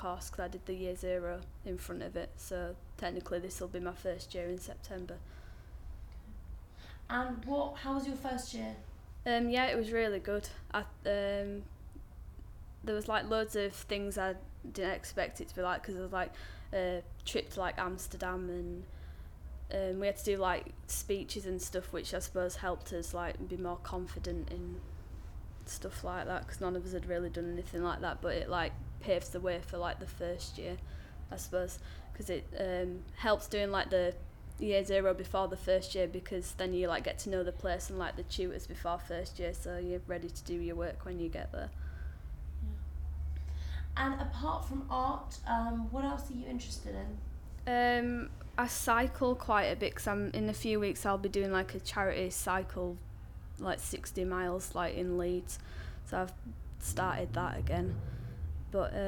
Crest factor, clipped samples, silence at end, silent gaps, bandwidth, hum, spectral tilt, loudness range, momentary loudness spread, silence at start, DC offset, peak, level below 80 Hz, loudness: 20 dB; under 0.1%; 0 s; none; 19 kHz; none; -4.5 dB/octave; 8 LU; 14 LU; 0 s; under 0.1%; -16 dBFS; -46 dBFS; -37 LUFS